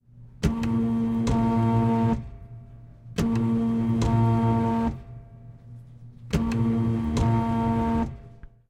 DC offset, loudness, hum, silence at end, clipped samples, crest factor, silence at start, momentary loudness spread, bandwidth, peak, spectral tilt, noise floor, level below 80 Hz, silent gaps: under 0.1%; -25 LUFS; none; 0.35 s; under 0.1%; 16 dB; 0.15 s; 22 LU; 10 kHz; -10 dBFS; -8 dB/octave; -46 dBFS; -38 dBFS; none